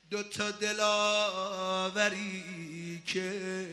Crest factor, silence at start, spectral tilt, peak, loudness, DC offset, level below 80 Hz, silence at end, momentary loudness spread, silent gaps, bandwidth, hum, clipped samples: 20 dB; 0.1 s; -3 dB/octave; -12 dBFS; -31 LUFS; under 0.1%; -74 dBFS; 0 s; 13 LU; none; 13 kHz; none; under 0.1%